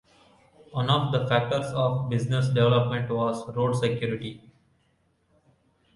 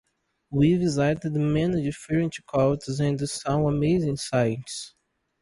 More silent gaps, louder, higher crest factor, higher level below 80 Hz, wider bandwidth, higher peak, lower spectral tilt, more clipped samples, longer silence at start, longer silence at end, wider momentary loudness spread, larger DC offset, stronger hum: neither; about the same, -26 LUFS vs -25 LUFS; about the same, 18 dB vs 16 dB; second, -58 dBFS vs -50 dBFS; about the same, 11.5 kHz vs 11.5 kHz; about the same, -8 dBFS vs -10 dBFS; about the same, -7 dB/octave vs -6.5 dB/octave; neither; first, 0.7 s vs 0.5 s; first, 1.6 s vs 0.55 s; about the same, 9 LU vs 7 LU; neither; neither